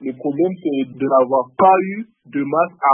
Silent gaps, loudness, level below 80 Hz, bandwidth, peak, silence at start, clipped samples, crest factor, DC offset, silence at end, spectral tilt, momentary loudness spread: none; -18 LUFS; -70 dBFS; 3.5 kHz; -2 dBFS; 0 s; under 0.1%; 14 dB; under 0.1%; 0 s; -12 dB/octave; 12 LU